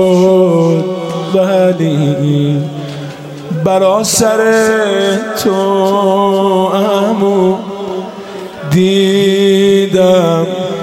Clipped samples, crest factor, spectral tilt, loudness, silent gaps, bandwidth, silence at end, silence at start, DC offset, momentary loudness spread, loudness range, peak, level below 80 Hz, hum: under 0.1%; 10 dB; -5.5 dB/octave; -11 LUFS; none; 16.5 kHz; 0 s; 0 s; under 0.1%; 12 LU; 2 LU; 0 dBFS; -52 dBFS; none